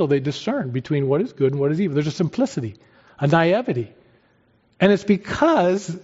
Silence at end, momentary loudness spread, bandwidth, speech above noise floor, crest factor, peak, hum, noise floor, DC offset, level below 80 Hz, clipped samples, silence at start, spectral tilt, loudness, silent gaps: 0.05 s; 8 LU; 8 kHz; 40 dB; 16 dB; -4 dBFS; none; -60 dBFS; under 0.1%; -56 dBFS; under 0.1%; 0 s; -6 dB/octave; -21 LUFS; none